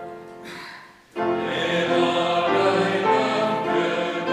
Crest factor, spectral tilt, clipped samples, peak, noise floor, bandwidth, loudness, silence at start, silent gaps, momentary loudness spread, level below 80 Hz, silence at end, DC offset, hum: 16 dB; -5 dB/octave; under 0.1%; -8 dBFS; -43 dBFS; 12.5 kHz; -22 LUFS; 0 s; none; 17 LU; -66 dBFS; 0 s; under 0.1%; none